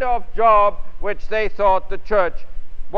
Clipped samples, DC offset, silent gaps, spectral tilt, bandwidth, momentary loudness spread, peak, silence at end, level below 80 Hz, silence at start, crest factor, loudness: under 0.1%; 5%; none; -6.5 dB/octave; 5 kHz; 13 LU; -2 dBFS; 0 s; -30 dBFS; 0 s; 14 dB; -19 LUFS